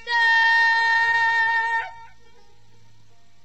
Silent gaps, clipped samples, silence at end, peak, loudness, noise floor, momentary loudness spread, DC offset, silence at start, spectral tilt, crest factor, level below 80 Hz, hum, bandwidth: none; under 0.1%; 1.4 s; -10 dBFS; -18 LUFS; -59 dBFS; 9 LU; 0.7%; 0.05 s; 0.5 dB/octave; 12 dB; -64 dBFS; none; 8.4 kHz